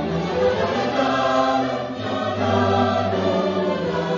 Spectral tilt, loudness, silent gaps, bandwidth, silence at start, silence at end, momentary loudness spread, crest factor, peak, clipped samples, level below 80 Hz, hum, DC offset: -6 dB/octave; -21 LUFS; none; 7.4 kHz; 0 s; 0 s; 6 LU; 16 dB; -4 dBFS; under 0.1%; -44 dBFS; none; under 0.1%